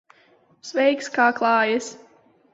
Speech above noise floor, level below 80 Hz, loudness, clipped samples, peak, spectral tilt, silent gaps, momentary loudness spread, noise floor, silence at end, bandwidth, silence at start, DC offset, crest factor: 37 dB; -74 dBFS; -21 LUFS; under 0.1%; -4 dBFS; -3 dB/octave; none; 14 LU; -58 dBFS; 0.55 s; 8 kHz; 0.65 s; under 0.1%; 18 dB